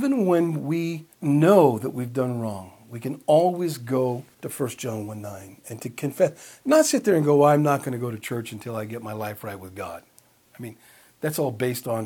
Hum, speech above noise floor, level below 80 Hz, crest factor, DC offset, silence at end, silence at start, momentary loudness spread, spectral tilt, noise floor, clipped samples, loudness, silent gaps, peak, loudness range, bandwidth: none; 33 dB; -70 dBFS; 20 dB; under 0.1%; 0 s; 0 s; 19 LU; -6 dB/octave; -56 dBFS; under 0.1%; -23 LUFS; none; -4 dBFS; 9 LU; 19 kHz